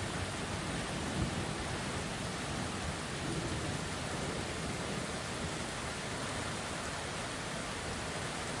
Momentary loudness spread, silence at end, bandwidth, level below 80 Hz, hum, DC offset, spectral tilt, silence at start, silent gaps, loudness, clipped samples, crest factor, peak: 2 LU; 0 s; 11.5 kHz; -52 dBFS; none; under 0.1%; -4 dB/octave; 0 s; none; -38 LUFS; under 0.1%; 16 dB; -20 dBFS